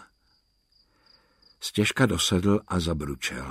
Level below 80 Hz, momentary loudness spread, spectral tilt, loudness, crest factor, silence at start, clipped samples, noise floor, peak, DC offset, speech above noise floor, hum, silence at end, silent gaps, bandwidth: -46 dBFS; 9 LU; -4.5 dB/octave; -25 LUFS; 20 dB; 0 s; under 0.1%; -68 dBFS; -8 dBFS; under 0.1%; 43 dB; none; 0 s; none; 16 kHz